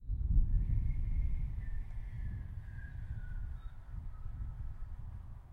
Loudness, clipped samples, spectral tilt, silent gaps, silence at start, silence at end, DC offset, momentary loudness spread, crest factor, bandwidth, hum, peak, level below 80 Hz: -41 LUFS; under 0.1%; -9.5 dB/octave; none; 0 s; 0 s; under 0.1%; 14 LU; 18 dB; 2.5 kHz; none; -18 dBFS; -36 dBFS